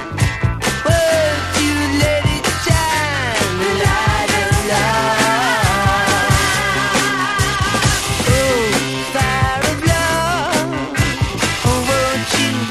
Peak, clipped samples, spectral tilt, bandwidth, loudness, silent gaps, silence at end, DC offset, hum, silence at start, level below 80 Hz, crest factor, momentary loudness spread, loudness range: 0 dBFS; under 0.1%; -4 dB/octave; 15.5 kHz; -15 LUFS; none; 0 s; under 0.1%; none; 0 s; -28 dBFS; 16 dB; 4 LU; 2 LU